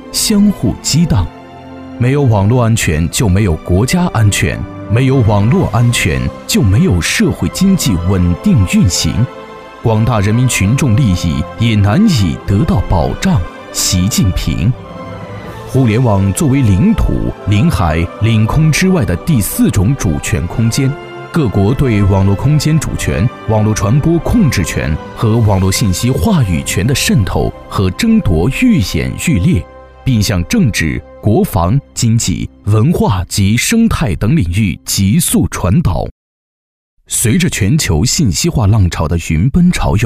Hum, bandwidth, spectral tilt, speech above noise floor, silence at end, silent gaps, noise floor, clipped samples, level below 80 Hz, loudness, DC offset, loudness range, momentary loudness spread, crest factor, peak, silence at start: none; 16 kHz; -5.5 dB/octave; over 79 dB; 0 s; 36.11-36.97 s; under -90 dBFS; under 0.1%; -24 dBFS; -12 LUFS; 0.1%; 2 LU; 6 LU; 10 dB; -2 dBFS; 0 s